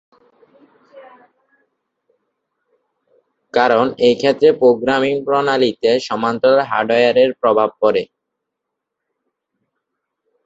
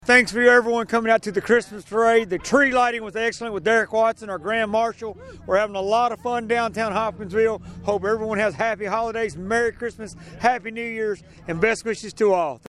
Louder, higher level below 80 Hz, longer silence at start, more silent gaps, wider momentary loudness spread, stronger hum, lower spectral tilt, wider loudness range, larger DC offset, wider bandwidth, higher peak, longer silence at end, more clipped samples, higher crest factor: first, -15 LUFS vs -21 LUFS; second, -60 dBFS vs -52 dBFS; first, 0.95 s vs 0.05 s; neither; second, 4 LU vs 11 LU; neither; about the same, -5.5 dB/octave vs -4.5 dB/octave; about the same, 6 LU vs 5 LU; neither; second, 8 kHz vs 12 kHz; about the same, 0 dBFS vs -2 dBFS; first, 2.4 s vs 0.1 s; neither; about the same, 16 dB vs 20 dB